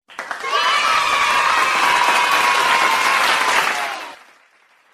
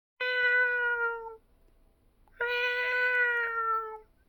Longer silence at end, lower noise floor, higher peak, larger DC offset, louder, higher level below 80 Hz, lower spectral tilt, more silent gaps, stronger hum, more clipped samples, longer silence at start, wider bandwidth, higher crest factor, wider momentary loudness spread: first, 0.8 s vs 0.25 s; second, -55 dBFS vs -64 dBFS; first, -2 dBFS vs -16 dBFS; neither; first, -15 LUFS vs -28 LUFS; first, -58 dBFS vs -64 dBFS; second, 0.5 dB/octave vs -1 dB/octave; neither; neither; neither; about the same, 0.1 s vs 0.2 s; second, 15.5 kHz vs over 20 kHz; about the same, 16 dB vs 14 dB; about the same, 11 LU vs 10 LU